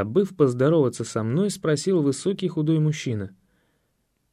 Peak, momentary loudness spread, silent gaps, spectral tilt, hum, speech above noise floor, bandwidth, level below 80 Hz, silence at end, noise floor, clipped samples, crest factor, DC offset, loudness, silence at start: -6 dBFS; 8 LU; none; -6.5 dB/octave; none; 49 dB; 12.5 kHz; -64 dBFS; 1.05 s; -71 dBFS; under 0.1%; 18 dB; under 0.1%; -23 LUFS; 0 s